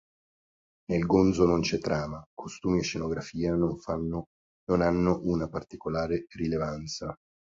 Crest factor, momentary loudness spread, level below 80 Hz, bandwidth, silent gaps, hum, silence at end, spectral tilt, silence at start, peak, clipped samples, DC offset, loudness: 20 dB; 14 LU; -48 dBFS; 7.6 kHz; 2.26-2.37 s, 4.26-4.67 s; none; 0.4 s; -6.5 dB/octave; 0.9 s; -8 dBFS; under 0.1%; under 0.1%; -29 LUFS